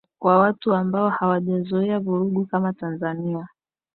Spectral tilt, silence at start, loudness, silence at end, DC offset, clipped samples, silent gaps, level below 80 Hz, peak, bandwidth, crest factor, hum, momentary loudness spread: -12.5 dB/octave; 0.2 s; -22 LUFS; 0.5 s; under 0.1%; under 0.1%; none; -66 dBFS; -6 dBFS; 4.3 kHz; 16 dB; none; 10 LU